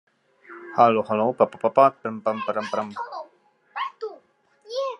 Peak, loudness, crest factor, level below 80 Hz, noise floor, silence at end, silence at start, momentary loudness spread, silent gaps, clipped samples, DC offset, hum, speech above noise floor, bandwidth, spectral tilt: -2 dBFS; -23 LUFS; 22 dB; -78 dBFS; -59 dBFS; 0.05 s; 0.5 s; 18 LU; none; under 0.1%; under 0.1%; none; 38 dB; 10 kHz; -6.5 dB/octave